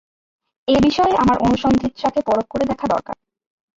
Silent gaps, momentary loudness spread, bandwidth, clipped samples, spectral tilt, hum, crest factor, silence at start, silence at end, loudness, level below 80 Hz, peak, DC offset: none; 9 LU; 7.8 kHz; under 0.1%; -6 dB/octave; none; 14 dB; 0.7 s; 0.65 s; -18 LUFS; -42 dBFS; -6 dBFS; under 0.1%